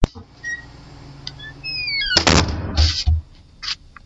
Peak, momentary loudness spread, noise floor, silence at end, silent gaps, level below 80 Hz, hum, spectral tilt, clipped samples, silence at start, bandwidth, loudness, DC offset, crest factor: 0 dBFS; 19 LU; -40 dBFS; 0.3 s; none; -28 dBFS; none; -3.5 dB/octave; under 0.1%; 0 s; 8 kHz; -19 LUFS; under 0.1%; 22 dB